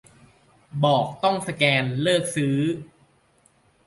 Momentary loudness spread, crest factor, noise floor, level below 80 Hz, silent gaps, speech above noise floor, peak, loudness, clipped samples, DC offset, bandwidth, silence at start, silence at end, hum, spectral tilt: 7 LU; 20 dB; -61 dBFS; -62 dBFS; none; 39 dB; -4 dBFS; -22 LUFS; under 0.1%; under 0.1%; 11.5 kHz; 0.75 s; 1.05 s; none; -5 dB/octave